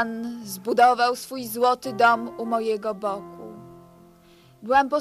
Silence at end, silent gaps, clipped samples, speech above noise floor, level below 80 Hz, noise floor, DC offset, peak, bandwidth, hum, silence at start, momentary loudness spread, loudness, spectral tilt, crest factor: 0 s; none; under 0.1%; 31 dB; -64 dBFS; -53 dBFS; under 0.1%; -6 dBFS; 14.5 kHz; none; 0 s; 17 LU; -23 LUFS; -4 dB/octave; 18 dB